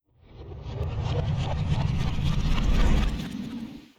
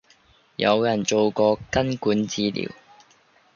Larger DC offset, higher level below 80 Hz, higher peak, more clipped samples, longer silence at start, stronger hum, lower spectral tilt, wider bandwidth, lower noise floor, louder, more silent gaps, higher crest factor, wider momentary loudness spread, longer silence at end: neither; first, -28 dBFS vs -52 dBFS; second, -12 dBFS vs -4 dBFS; neither; second, 0.35 s vs 0.6 s; neither; first, -6.5 dB/octave vs -4.5 dB/octave; first, 10.5 kHz vs 7.4 kHz; second, -46 dBFS vs -58 dBFS; second, -28 LUFS vs -22 LUFS; neither; second, 14 dB vs 20 dB; first, 13 LU vs 9 LU; second, 0.15 s vs 0.85 s